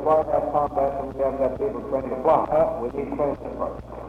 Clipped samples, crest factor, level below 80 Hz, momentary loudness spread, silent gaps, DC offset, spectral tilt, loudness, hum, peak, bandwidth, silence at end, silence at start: under 0.1%; 18 dB; -44 dBFS; 9 LU; none; under 0.1%; -9 dB/octave; -24 LUFS; none; -6 dBFS; 7 kHz; 0 s; 0 s